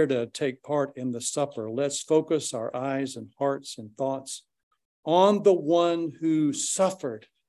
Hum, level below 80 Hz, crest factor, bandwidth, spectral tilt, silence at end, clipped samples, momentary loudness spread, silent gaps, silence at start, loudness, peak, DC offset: none; -76 dBFS; 20 dB; 12.5 kHz; -4.5 dB/octave; 0.3 s; under 0.1%; 13 LU; 4.63-4.71 s, 4.85-5.03 s; 0 s; -26 LUFS; -6 dBFS; under 0.1%